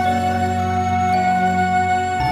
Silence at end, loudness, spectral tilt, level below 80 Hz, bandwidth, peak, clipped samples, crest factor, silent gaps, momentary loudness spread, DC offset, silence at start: 0 s; -18 LUFS; -6 dB/octave; -42 dBFS; 13.5 kHz; -8 dBFS; under 0.1%; 10 dB; none; 3 LU; under 0.1%; 0 s